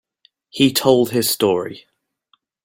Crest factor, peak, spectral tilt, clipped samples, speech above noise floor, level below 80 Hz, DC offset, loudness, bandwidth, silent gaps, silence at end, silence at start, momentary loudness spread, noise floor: 18 dB; -2 dBFS; -4 dB/octave; under 0.1%; 47 dB; -58 dBFS; under 0.1%; -17 LUFS; 17 kHz; none; 0.85 s; 0.55 s; 13 LU; -64 dBFS